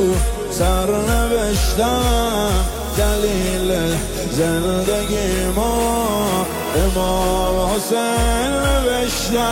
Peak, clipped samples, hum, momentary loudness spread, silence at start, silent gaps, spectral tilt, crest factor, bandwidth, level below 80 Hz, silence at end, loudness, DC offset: -6 dBFS; under 0.1%; none; 3 LU; 0 s; none; -4.5 dB/octave; 12 dB; 17 kHz; -24 dBFS; 0 s; -18 LUFS; under 0.1%